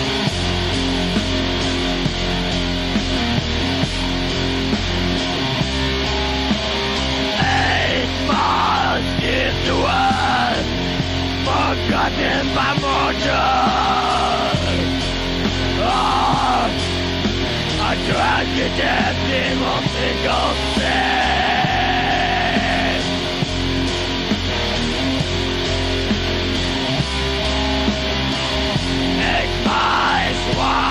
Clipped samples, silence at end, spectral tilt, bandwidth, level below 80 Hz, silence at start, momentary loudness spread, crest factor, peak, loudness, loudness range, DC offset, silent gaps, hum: under 0.1%; 0 s; -4.5 dB/octave; 15.5 kHz; -30 dBFS; 0 s; 4 LU; 12 dB; -6 dBFS; -18 LUFS; 2 LU; under 0.1%; none; none